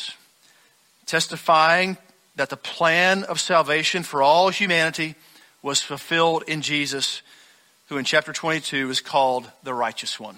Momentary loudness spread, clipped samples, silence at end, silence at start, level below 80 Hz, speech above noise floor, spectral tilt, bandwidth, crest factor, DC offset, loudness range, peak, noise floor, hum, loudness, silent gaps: 12 LU; under 0.1%; 0.05 s; 0 s; -68 dBFS; 37 dB; -2.5 dB/octave; 16 kHz; 18 dB; under 0.1%; 4 LU; -4 dBFS; -59 dBFS; none; -21 LUFS; none